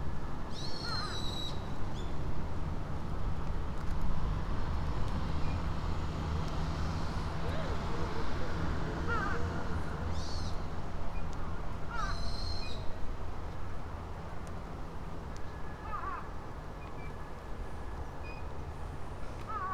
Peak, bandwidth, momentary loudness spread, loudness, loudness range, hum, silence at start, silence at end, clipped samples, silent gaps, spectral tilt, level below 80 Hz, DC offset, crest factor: -18 dBFS; 9.6 kHz; 8 LU; -39 LUFS; 7 LU; none; 0 s; 0 s; under 0.1%; none; -6 dB/octave; -40 dBFS; under 0.1%; 16 dB